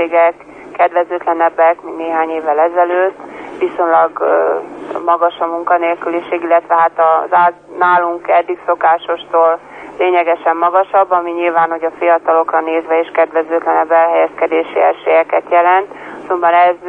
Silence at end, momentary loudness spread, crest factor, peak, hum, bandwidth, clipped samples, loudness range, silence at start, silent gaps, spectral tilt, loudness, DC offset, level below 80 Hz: 0 s; 8 LU; 12 dB; -2 dBFS; none; 4.1 kHz; under 0.1%; 2 LU; 0 s; none; -6 dB/octave; -13 LUFS; under 0.1%; -62 dBFS